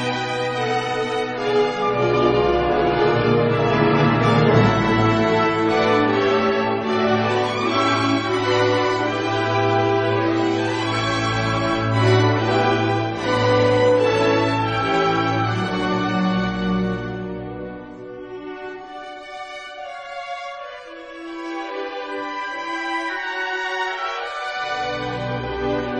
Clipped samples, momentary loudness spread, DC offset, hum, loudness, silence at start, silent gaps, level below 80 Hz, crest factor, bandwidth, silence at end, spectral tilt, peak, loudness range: under 0.1%; 16 LU; under 0.1%; none; -20 LUFS; 0 s; none; -44 dBFS; 18 dB; 9.4 kHz; 0 s; -6 dB/octave; -2 dBFS; 14 LU